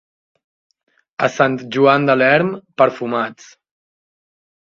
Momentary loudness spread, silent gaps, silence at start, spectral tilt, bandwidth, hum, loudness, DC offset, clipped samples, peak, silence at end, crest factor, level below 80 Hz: 10 LU; none; 1.2 s; -6 dB/octave; 7.4 kHz; none; -16 LUFS; under 0.1%; under 0.1%; 0 dBFS; 1.35 s; 18 dB; -64 dBFS